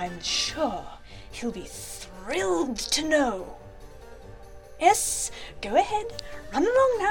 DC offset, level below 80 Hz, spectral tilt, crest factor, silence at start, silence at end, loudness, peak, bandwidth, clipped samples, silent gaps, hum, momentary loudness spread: 0.2%; -48 dBFS; -2.5 dB/octave; 22 dB; 0 s; 0 s; -26 LUFS; -4 dBFS; 17.5 kHz; under 0.1%; none; none; 21 LU